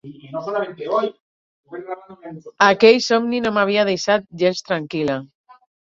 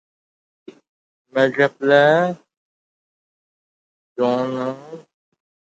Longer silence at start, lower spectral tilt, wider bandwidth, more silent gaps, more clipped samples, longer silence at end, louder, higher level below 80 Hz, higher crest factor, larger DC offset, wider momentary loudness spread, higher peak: second, 0.05 s vs 1.35 s; second, -4.5 dB/octave vs -6.5 dB/octave; about the same, 7.6 kHz vs 8 kHz; second, 1.20-1.64 s vs 2.57-4.16 s; neither; about the same, 0.7 s vs 0.8 s; about the same, -18 LUFS vs -18 LUFS; first, -62 dBFS vs -76 dBFS; about the same, 20 dB vs 20 dB; neither; about the same, 21 LU vs 22 LU; about the same, 0 dBFS vs -2 dBFS